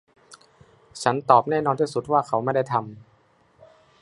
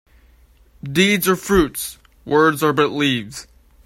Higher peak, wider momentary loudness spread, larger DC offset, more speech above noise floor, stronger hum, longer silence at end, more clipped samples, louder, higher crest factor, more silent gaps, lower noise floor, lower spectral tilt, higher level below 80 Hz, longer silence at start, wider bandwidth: about the same, -2 dBFS vs -2 dBFS; second, 9 LU vs 19 LU; neither; first, 38 dB vs 34 dB; neither; first, 1 s vs 0.45 s; neither; second, -22 LUFS vs -18 LUFS; first, 24 dB vs 18 dB; neither; first, -60 dBFS vs -51 dBFS; first, -6 dB/octave vs -4.5 dB/octave; second, -66 dBFS vs -42 dBFS; second, 0.3 s vs 0.85 s; second, 11.5 kHz vs 16 kHz